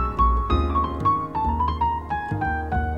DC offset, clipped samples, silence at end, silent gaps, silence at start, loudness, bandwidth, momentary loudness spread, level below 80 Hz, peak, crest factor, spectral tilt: 0.3%; under 0.1%; 0 s; none; 0 s; -23 LUFS; 5.6 kHz; 4 LU; -28 dBFS; -8 dBFS; 14 dB; -8.5 dB/octave